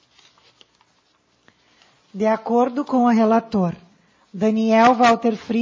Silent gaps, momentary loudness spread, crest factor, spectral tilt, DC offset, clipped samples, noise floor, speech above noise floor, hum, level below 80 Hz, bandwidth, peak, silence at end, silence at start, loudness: none; 11 LU; 16 dB; -6.5 dB/octave; under 0.1%; under 0.1%; -62 dBFS; 45 dB; none; -64 dBFS; 7.6 kHz; -4 dBFS; 0 s; 2.15 s; -18 LUFS